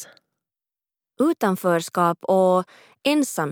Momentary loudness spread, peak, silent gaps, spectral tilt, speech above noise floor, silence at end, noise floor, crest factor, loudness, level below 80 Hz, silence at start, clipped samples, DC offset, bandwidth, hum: 5 LU; -6 dBFS; none; -5 dB/octave; over 69 dB; 0 s; under -90 dBFS; 16 dB; -21 LUFS; -84 dBFS; 0 s; under 0.1%; under 0.1%; over 20 kHz; none